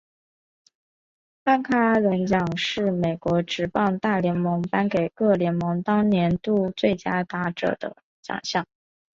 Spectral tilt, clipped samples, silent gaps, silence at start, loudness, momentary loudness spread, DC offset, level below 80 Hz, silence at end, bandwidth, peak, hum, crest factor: -6.5 dB/octave; under 0.1%; 8.04-8.23 s; 1.45 s; -23 LUFS; 8 LU; under 0.1%; -56 dBFS; 0.55 s; 7.6 kHz; -6 dBFS; none; 18 dB